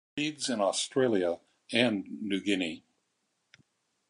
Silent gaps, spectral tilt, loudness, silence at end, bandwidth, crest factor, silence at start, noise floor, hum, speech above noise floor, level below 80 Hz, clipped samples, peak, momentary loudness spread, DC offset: none; -3.5 dB/octave; -30 LUFS; 1.3 s; 11.5 kHz; 22 dB; 0.15 s; -78 dBFS; none; 49 dB; -72 dBFS; under 0.1%; -10 dBFS; 8 LU; under 0.1%